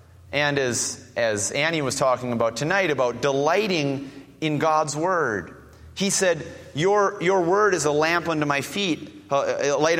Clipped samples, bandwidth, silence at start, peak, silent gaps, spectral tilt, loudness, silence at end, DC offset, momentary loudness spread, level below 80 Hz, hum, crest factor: under 0.1%; 16.5 kHz; 0.25 s; -4 dBFS; none; -3.5 dB/octave; -23 LUFS; 0 s; under 0.1%; 8 LU; -58 dBFS; none; 18 dB